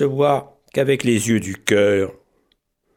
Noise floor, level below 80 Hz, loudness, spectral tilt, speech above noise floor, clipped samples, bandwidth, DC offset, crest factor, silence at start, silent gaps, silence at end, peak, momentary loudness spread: -67 dBFS; -58 dBFS; -19 LUFS; -5 dB/octave; 49 dB; under 0.1%; 17 kHz; under 0.1%; 20 dB; 0 s; none; 0.85 s; 0 dBFS; 7 LU